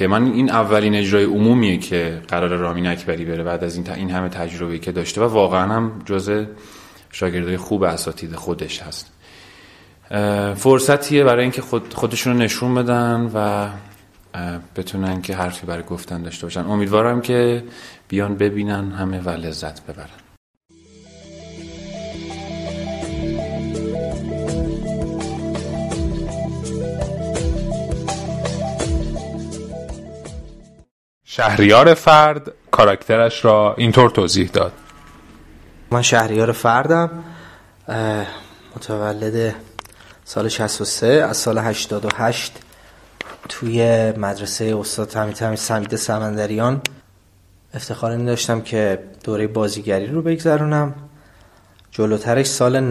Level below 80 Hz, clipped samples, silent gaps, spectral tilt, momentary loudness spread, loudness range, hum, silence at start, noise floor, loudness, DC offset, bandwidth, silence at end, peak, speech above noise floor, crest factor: -38 dBFS; under 0.1%; 20.37-20.61 s, 30.91-31.21 s; -5 dB/octave; 16 LU; 11 LU; none; 0 s; -52 dBFS; -19 LUFS; under 0.1%; 15.5 kHz; 0 s; 0 dBFS; 34 dB; 20 dB